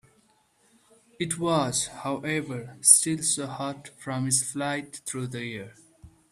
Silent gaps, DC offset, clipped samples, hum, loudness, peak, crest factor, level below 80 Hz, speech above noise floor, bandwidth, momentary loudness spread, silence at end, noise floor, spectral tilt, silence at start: none; under 0.1%; under 0.1%; none; -25 LUFS; 0 dBFS; 28 dB; -64 dBFS; 38 dB; 15.5 kHz; 18 LU; 0.25 s; -65 dBFS; -3 dB/octave; 1.2 s